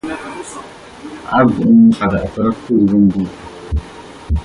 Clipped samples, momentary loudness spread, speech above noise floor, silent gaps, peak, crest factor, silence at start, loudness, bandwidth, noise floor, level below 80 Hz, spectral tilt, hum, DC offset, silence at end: under 0.1%; 23 LU; 20 dB; none; -2 dBFS; 14 dB; 0.05 s; -14 LUFS; 11 kHz; -34 dBFS; -28 dBFS; -7.5 dB/octave; none; under 0.1%; 0 s